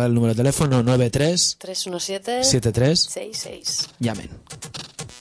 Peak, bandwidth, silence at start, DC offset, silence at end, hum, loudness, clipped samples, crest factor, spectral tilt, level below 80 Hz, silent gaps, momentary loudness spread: -6 dBFS; 11 kHz; 0 s; under 0.1%; 0 s; none; -20 LUFS; under 0.1%; 16 dB; -4.5 dB/octave; -46 dBFS; none; 15 LU